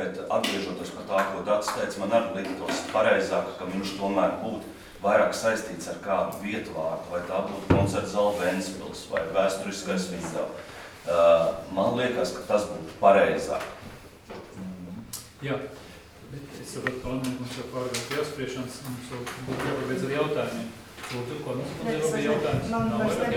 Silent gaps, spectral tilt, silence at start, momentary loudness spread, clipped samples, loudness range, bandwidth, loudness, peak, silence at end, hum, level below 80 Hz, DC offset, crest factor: none; -5 dB/octave; 0 s; 16 LU; under 0.1%; 8 LU; 19.5 kHz; -27 LUFS; -4 dBFS; 0 s; none; -54 dBFS; under 0.1%; 22 dB